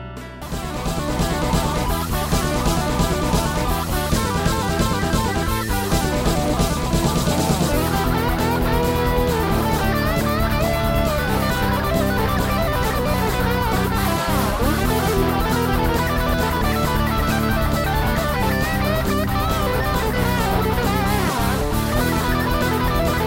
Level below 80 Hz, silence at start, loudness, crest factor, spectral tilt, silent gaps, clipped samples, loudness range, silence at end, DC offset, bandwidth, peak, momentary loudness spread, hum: -26 dBFS; 0 s; -20 LUFS; 16 dB; -5 dB/octave; none; under 0.1%; 1 LU; 0 s; under 0.1%; 17 kHz; -4 dBFS; 2 LU; none